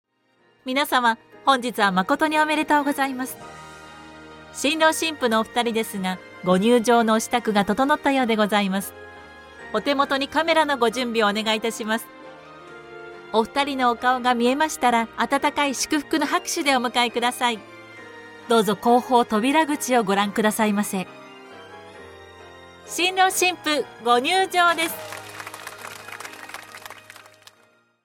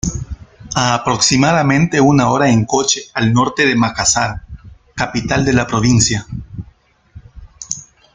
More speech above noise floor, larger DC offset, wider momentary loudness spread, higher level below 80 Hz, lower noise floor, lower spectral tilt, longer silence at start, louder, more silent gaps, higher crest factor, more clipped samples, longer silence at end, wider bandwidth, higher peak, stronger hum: first, 41 dB vs 35 dB; neither; first, 22 LU vs 18 LU; second, -62 dBFS vs -36 dBFS; first, -62 dBFS vs -49 dBFS; about the same, -3.5 dB/octave vs -4 dB/octave; first, 0.65 s vs 0.05 s; second, -21 LUFS vs -14 LUFS; neither; about the same, 18 dB vs 16 dB; neither; first, 1.1 s vs 0.3 s; first, 17 kHz vs 9.6 kHz; second, -6 dBFS vs 0 dBFS; neither